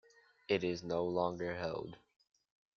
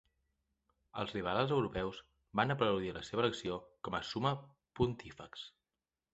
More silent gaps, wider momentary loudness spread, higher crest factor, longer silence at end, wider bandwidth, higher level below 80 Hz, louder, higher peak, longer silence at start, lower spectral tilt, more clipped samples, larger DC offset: neither; second, 12 LU vs 16 LU; about the same, 22 dB vs 24 dB; first, 0.8 s vs 0.65 s; second, 7 kHz vs 8 kHz; second, -70 dBFS vs -60 dBFS; about the same, -37 LUFS vs -37 LUFS; second, -18 dBFS vs -14 dBFS; second, 0.5 s vs 0.95 s; about the same, -4.5 dB/octave vs -4.5 dB/octave; neither; neither